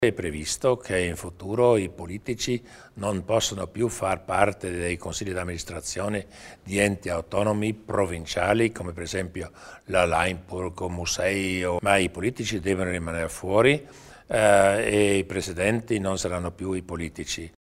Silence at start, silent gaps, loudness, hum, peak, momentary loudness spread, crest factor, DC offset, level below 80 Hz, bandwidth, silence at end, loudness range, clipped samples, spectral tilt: 0 s; none; -26 LUFS; none; -4 dBFS; 11 LU; 22 dB; under 0.1%; -48 dBFS; 16 kHz; 0.3 s; 5 LU; under 0.1%; -4.5 dB/octave